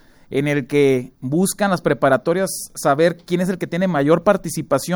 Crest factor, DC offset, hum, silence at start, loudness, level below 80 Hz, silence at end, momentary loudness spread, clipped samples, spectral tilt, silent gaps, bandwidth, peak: 18 dB; under 0.1%; none; 0.3 s; -19 LUFS; -52 dBFS; 0 s; 6 LU; under 0.1%; -5.5 dB/octave; none; over 20 kHz; 0 dBFS